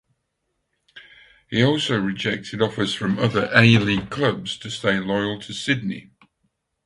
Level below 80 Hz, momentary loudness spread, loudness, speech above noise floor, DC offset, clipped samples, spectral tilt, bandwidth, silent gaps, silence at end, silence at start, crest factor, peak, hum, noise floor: -54 dBFS; 12 LU; -21 LUFS; 54 dB; under 0.1%; under 0.1%; -5.5 dB/octave; 11.5 kHz; none; 0.85 s; 0.95 s; 22 dB; 0 dBFS; none; -75 dBFS